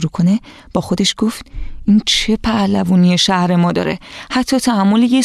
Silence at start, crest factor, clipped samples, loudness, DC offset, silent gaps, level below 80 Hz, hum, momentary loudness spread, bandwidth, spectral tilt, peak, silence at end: 0 s; 12 dB; under 0.1%; -15 LUFS; under 0.1%; none; -34 dBFS; none; 10 LU; 13.5 kHz; -5 dB/octave; -2 dBFS; 0 s